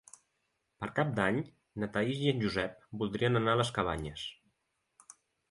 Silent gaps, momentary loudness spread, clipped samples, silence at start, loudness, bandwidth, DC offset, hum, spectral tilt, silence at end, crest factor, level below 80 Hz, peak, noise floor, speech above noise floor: none; 12 LU; under 0.1%; 0.8 s; -33 LUFS; 11.5 kHz; under 0.1%; none; -6 dB/octave; 1.15 s; 22 dB; -58 dBFS; -12 dBFS; -80 dBFS; 48 dB